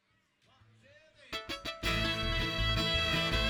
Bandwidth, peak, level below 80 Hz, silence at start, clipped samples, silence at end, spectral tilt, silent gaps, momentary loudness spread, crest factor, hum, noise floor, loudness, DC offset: 19 kHz; -16 dBFS; -42 dBFS; 1.2 s; under 0.1%; 0 s; -4 dB/octave; none; 10 LU; 18 dB; none; -72 dBFS; -32 LUFS; under 0.1%